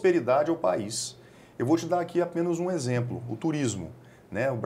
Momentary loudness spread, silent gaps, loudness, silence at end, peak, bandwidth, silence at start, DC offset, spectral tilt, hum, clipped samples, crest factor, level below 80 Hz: 12 LU; none; -28 LUFS; 0 s; -12 dBFS; 14 kHz; 0 s; under 0.1%; -5.5 dB/octave; none; under 0.1%; 16 dB; -64 dBFS